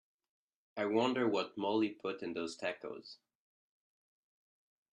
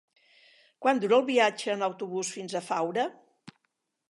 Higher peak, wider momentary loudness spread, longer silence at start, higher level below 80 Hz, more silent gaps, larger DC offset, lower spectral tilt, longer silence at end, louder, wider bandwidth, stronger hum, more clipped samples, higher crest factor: second, -18 dBFS vs -10 dBFS; first, 16 LU vs 10 LU; about the same, 0.75 s vs 0.8 s; about the same, -84 dBFS vs -86 dBFS; neither; neither; first, -5 dB/octave vs -3.5 dB/octave; first, 1.8 s vs 0.6 s; second, -36 LUFS vs -28 LUFS; second, 10 kHz vs 11.5 kHz; neither; neither; about the same, 20 dB vs 20 dB